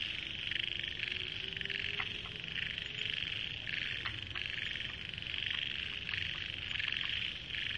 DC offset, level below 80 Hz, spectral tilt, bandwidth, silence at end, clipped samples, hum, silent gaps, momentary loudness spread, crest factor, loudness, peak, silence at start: under 0.1%; -58 dBFS; -3 dB/octave; 11 kHz; 0 s; under 0.1%; none; none; 4 LU; 20 dB; -37 LUFS; -20 dBFS; 0 s